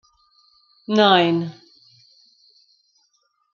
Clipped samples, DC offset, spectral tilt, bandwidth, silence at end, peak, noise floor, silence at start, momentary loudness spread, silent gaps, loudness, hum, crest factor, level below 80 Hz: under 0.1%; under 0.1%; -6 dB/octave; 7.2 kHz; 2.05 s; -2 dBFS; -67 dBFS; 0.9 s; 19 LU; none; -17 LUFS; none; 22 dB; -72 dBFS